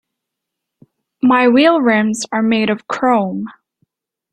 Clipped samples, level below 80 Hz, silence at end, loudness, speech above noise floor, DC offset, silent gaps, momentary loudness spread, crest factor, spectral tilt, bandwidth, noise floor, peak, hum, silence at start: under 0.1%; -60 dBFS; 0.8 s; -14 LUFS; 66 dB; under 0.1%; none; 10 LU; 16 dB; -5 dB/octave; 11 kHz; -79 dBFS; -2 dBFS; none; 1.25 s